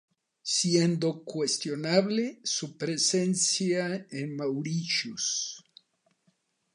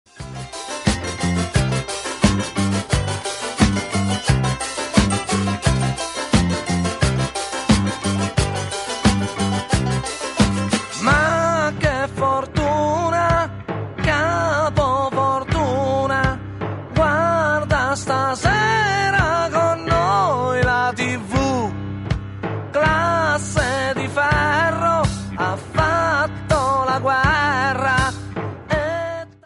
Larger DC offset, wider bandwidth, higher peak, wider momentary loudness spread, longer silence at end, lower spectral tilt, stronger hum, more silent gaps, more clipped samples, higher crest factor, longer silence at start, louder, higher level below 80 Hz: neither; about the same, 11 kHz vs 11.5 kHz; second, -10 dBFS vs 0 dBFS; about the same, 8 LU vs 8 LU; first, 1.15 s vs 0.15 s; second, -3.5 dB/octave vs -5 dB/octave; neither; neither; neither; about the same, 20 dB vs 18 dB; first, 0.45 s vs 0.15 s; second, -28 LUFS vs -19 LUFS; second, -80 dBFS vs -34 dBFS